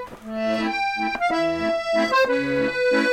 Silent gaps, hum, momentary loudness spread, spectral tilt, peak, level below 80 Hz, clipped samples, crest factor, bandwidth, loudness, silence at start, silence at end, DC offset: none; none; 5 LU; -4.5 dB/octave; -8 dBFS; -54 dBFS; under 0.1%; 14 dB; 16 kHz; -22 LUFS; 0 s; 0 s; under 0.1%